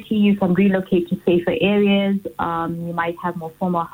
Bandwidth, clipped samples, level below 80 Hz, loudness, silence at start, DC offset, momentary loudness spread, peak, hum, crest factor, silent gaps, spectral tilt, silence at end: 16 kHz; under 0.1%; -52 dBFS; -20 LUFS; 0 s; under 0.1%; 8 LU; -6 dBFS; none; 14 dB; none; -8.5 dB/octave; 0.05 s